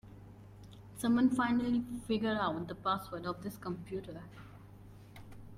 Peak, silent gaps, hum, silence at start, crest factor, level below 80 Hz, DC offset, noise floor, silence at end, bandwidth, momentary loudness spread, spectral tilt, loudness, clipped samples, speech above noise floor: -18 dBFS; none; 50 Hz at -50 dBFS; 0.05 s; 18 dB; -60 dBFS; under 0.1%; -54 dBFS; 0 s; 15 kHz; 25 LU; -6 dB/octave; -34 LUFS; under 0.1%; 20 dB